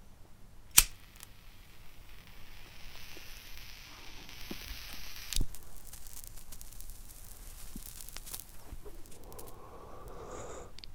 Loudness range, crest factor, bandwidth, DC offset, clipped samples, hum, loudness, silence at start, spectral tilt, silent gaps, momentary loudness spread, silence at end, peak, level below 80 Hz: 16 LU; 38 dB; 18 kHz; under 0.1%; under 0.1%; none; -34 LUFS; 0 s; -0.5 dB/octave; none; 16 LU; 0 s; 0 dBFS; -46 dBFS